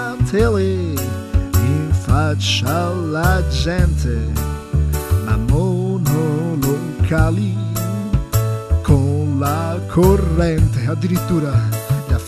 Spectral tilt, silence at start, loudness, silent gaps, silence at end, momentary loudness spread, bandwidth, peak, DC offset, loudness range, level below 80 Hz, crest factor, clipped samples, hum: -6.5 dB/octave; 0 s; -18 LUFS; none; 0 s; 5 LU; 16 kHz; 0 dBFS; under 0.1%; 2 LU; -24 dBFS; 16 dB; under 0.1%; none